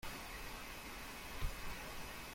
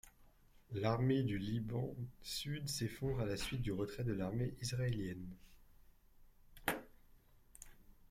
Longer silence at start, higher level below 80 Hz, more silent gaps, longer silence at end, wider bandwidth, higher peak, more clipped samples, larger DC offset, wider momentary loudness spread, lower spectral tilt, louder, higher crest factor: about the same, 0 s vs 0.05 s; first, -50 dBFS vs -58 dBFS; neither; second, 0 s vs 0.15 s; about the same, 16.5 kHz vs 16 kHz; second, -28 dBFS vs -20 dBFS; neither; neither; second, 2 LU vs 15 LU; second, -3 dB/octave vs -5.5 dB/octave; second, -48 LUFS vs -41 LUFS; about the same, 18 dB vs 22 dB